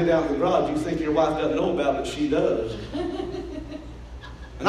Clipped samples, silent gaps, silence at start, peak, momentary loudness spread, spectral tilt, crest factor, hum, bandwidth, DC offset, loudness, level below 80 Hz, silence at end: under 0.1%; none; 0 s; -8 dBFS; 18 LU; -6.5 dB/octave; 16 dB; none; 12 kHz; under 0.1%; -25 LUFS; -42 dBFS; 0 s